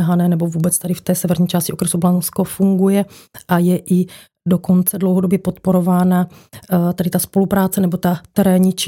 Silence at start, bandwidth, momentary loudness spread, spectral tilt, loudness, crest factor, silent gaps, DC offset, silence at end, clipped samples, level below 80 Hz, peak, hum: 0 s; 17 kHz; 5 LU; -6 dB/octave; -16 LUFS; 14 dB; none; under 0.1%; 0 s; under 0.1%; -52 dBFS; -2 dBFS; none